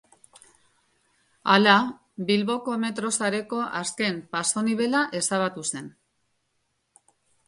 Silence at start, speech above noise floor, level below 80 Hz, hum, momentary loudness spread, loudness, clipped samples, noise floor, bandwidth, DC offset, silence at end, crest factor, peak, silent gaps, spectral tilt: 1.45 s; 50 dB; -72 dBFS; none; 12 LU; -24 LUFS; under 0.1%; -74 dBFS; 11.5 kHz; under 0.1%; 1.55 s; 24 dB; -2 dBFS; none; -3 dB/octave